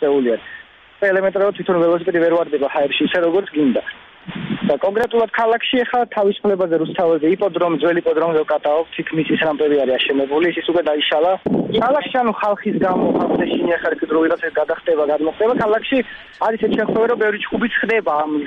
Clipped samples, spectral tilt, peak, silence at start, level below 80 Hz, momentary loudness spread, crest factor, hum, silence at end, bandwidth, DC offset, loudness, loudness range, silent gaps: under 0.1%; -7.5 dB/octave; -4 dBFS; 0 s; -54 dBFS; 4 LU; 14 dB; none; 0 s; 5.8 kHz; under 0.1%; -18 LUFS; 1 LU; none